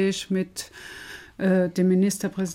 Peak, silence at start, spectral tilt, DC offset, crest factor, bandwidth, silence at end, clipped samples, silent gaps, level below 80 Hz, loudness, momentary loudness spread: -12 dBFS; 0 s; -5.5 dB/octave; under 0.1%; 14 dB; 16 kHz; 0 s; under 0.1%; none; -60 dBFS; -24 LUFS; 18 LU